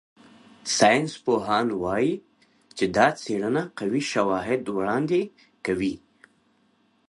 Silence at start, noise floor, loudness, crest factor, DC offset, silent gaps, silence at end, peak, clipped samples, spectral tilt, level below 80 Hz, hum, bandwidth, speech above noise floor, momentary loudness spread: 0.65 s; -65 dBFS; -24 LUFS; 20 dB; under 0.1%; none; 1.1 s; -4 dBFS; under 0.1%; -4.5 dB/octave; -58 dBFS; none; 11.5 kHz; 41 dB; 12 LU